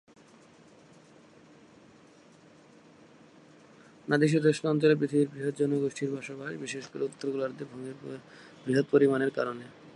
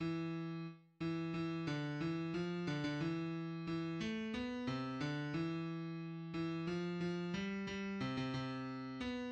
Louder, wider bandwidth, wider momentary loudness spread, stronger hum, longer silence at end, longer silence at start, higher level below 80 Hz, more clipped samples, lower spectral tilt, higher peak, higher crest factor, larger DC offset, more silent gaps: first, -29 LUFS vs -42 LUFS; first, 11.5 kHz vs 8.4 kHz; first, 18 LU vs 4 LU; neither; about the same, 0.05 s vs 0 s; first, 4.05 s vs 0 s; second, -76 dBFS vs -68 dBFS; neither; about the same, -6.5 dB/octave vs -7 dB/octave; first, -10 dBFS vs -28 dBFS; first, 20 dB vs 14 dB; neither; neither